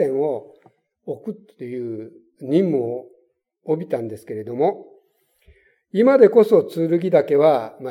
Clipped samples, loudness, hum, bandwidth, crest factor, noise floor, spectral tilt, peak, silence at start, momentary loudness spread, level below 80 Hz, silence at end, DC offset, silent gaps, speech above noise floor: under 0.1%; -19 LUFS; none; 13.5 kHz; 20 dB; -62 dBFS; -8.5 dB/octave; 0 dBFS; 0 s; 21 LU; -70 dBFS; 0 s; under 0.1%; none; 44 dB